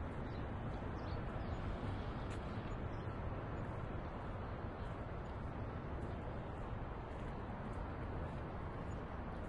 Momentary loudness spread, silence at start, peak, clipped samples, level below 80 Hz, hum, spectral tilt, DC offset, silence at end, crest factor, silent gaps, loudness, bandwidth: 2 LU; 0 s; -30 dBFS; under 0.1%; -50 dBFS; none; -8 dB/octave; under 0.1%; 0 s; 14 dB; none; -46 LUFS; 10.5 kHz